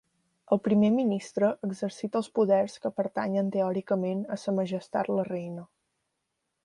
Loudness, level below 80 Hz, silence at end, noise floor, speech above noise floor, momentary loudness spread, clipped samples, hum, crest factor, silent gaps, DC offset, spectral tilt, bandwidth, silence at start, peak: -28 LUFS; -72 dBFS; 1 s; -81 dBFS; 54 dB; 9 LU; under 0.1%; none; 18 dB; none; under 0.1%; -7.5 dB/octave; 11 kHz; 0.5 s; -10 dBFS